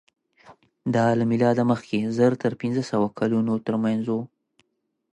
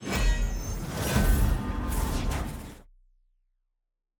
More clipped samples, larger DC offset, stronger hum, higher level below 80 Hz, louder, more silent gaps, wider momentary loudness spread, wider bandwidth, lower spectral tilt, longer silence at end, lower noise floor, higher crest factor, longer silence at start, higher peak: neither; neither; neither; second, -64 dBFS vs -30 dBFS; first, -23 LUFS vs -29 LUFS; neither; second, 7 LU vs 11 LU; second, 10 kHz vs over 20 kHz; first, -7.5 dB/octave vs -5 dB/octave; second, 0.9 s vs 1.35 s; second, -75 dBFS vs -82 dBFS; about the same, 16 dB vs 18 dB; first, 0.5 s vs 0 s; about the same, -8 dBFS vs -10 dBFS